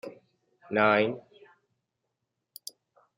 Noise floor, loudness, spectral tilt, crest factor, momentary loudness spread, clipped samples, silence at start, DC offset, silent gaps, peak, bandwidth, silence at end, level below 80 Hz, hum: -83 dBFS; -26 LUFS; -5 dB/octave; 22 dB; 22 LU; under 0.1%; 0.05 s; under 0.1%; none; -10 dBFS; 15.5 kHz; 1.95 s; -76 dBFS; none